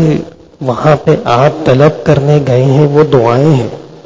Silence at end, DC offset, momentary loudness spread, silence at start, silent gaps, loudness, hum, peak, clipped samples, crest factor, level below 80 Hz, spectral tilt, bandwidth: 0.05 s; under 0.1%; 9 LU; 0 s; none; -9 LUFS; none; 0 dBFS; 1%; 8 dB; -38 dBFS; -8 dB/octave; 7.6 kHz